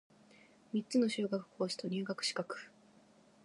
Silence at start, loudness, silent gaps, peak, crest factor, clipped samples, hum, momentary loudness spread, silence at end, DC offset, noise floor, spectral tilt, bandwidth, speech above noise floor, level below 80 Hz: 0.75 s; -37 LUFS; none; -22 dBFS; 18 dB; under 0.1%; none; 11 LU; 0.75 s; under 0.1%; -65 dBFS; -4.5 dB/octave; 11.5 kHz; 28 dB; -88 dBFS